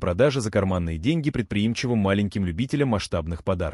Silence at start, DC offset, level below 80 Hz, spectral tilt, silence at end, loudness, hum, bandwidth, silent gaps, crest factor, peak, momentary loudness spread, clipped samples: 0 s; under 0.1%; -42 dBFS; -6.5 dB/octave; 0 s; -24 LUFS; none; 12 kHz; none; 16 dB; -8 dBFS; 5 LU; under 0.1%